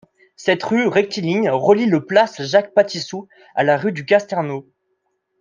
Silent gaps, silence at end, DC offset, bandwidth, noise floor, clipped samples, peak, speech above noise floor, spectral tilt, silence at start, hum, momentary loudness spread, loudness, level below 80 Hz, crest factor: none; 0.8 s; under 0.1%; 7.6 kHz; -70 dBFS; under 0.1%; -2 dBFS; 53 dB; -5.5 dB/octave; 0.4 s; none; 11 LU; -18 LUFS; -66 dBFS; 16 dB